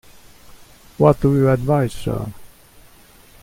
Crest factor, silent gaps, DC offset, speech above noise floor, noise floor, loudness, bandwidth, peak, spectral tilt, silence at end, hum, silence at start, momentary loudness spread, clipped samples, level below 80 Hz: 20 dB; none; under 0.1%; 31 dB; -47 dBFS; -18 LUFS; 16 kHz; 0 dBFS; -8 dB/octave; 0.95 s; none; 0.5 s; 12 LU; under 0.1%; -40 dBFS